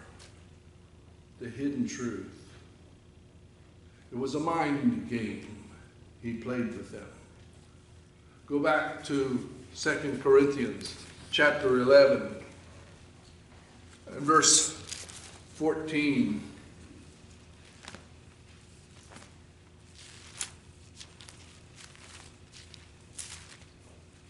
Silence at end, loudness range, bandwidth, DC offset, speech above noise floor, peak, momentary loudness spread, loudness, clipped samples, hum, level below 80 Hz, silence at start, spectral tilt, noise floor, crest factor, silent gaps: 0.65 s; 21 LU; 12.5 kHz; under 0.1%; 28 dB; -8 dBFS; 27 LU; -28 LUFS; under 0.1%; none; -60 dBFS; 0 s; -3 dB/octave; -55 dBFS; 24 dB; none